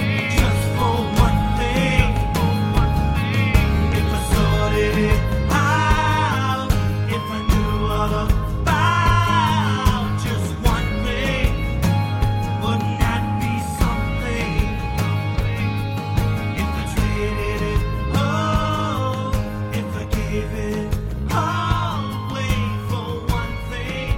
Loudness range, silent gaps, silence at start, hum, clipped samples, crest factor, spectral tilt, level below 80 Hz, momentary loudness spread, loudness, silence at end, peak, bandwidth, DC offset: 4 LU; none; 0 s; none; under 0.1%; 18 dB; -6 dB/octave; -26 dBFS; 7 LU; -21 LUFS; 0 s; 0 dBFS; 16.5 kHz; under 0.1%